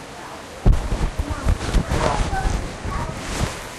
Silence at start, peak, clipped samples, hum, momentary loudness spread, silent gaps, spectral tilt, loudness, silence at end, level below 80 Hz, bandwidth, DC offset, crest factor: 0 s; -6 dBFS; under 0.1%; none; 7 LU; none; -5 dB/octave; -24 LUFS; 0 s; -24 dBFS; 13 kHz; under 0.1%; 16 dB